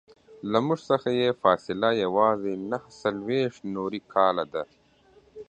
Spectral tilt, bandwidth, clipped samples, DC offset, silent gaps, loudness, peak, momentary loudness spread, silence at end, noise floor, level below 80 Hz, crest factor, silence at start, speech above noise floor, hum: -6.5 dB/octave; 9 kHz; under 0.1%; under 0.1%; none; -26 LUFS; -6 dBFS; 10 LU; 0.05 s; -59 dBFS; -66 dBFS; 22 dB; 0.3 s; 33 dB; none